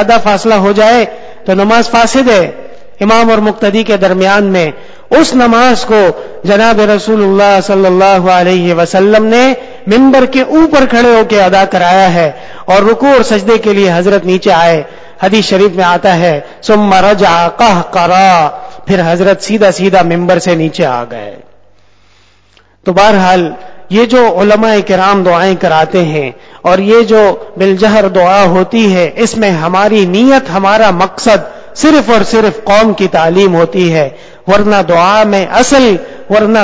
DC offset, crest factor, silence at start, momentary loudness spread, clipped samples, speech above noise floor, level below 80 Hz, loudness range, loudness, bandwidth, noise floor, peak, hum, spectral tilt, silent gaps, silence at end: under 0.1%; 8 dB; 0 s; 7 LU; 2%; 41 dB; -38 dBFS; 3 LU; -8 LUFS; 8 kHz; -47 dBFS; 0 dBFS; none; -5.5 dB/octave; none; 0 s